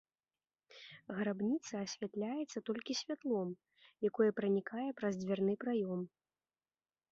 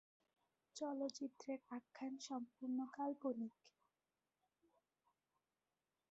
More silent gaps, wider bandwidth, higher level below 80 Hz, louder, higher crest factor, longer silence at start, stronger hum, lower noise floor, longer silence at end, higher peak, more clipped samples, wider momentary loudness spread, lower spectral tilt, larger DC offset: neither; about the same, 7.6 kHz vs 7.6 kHz; first, -82 dBFS vs under -90 dBFS; first, -38 LUFS vs -48 LUFS; about the same, 18 dB vs 18 dB; about the same, 0.75 s vs 0.75 s; neither; about the same, under -90 dBFS vs under -90 dBFS; second, 1.05 s vs 2.4 s; first, -20 dBFS vs -32 dBFS; neither; first, 12 LU vs 7 LU; first, -5.5 dB/octave vs -3.5 dB/octave; neither